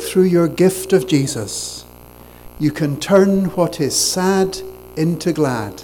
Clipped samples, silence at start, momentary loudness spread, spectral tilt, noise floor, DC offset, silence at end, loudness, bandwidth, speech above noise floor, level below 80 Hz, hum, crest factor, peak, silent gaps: under 0.1%; 0 s; 10 LU; -5 dB/octave; -41 dBFS; under 0.1%; 0 s; -17 LUFS; 18.5 kHz; 24 dB; -46 dBFS; 60 Hz at -45 dBFS; 16 dB; -2 dBFS; none